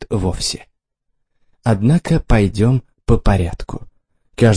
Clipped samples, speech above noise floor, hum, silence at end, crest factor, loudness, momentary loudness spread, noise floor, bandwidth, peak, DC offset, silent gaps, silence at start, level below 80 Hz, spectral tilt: under 0.1%; 55 dB; none; 0 s; 16 dB; -17 LUFS; 16 LU; -70 dBFS; 10.5 kHz; 0 dBFS; under 0.1%; none; 0 s; -26 dBFS; -6.5 dB/octave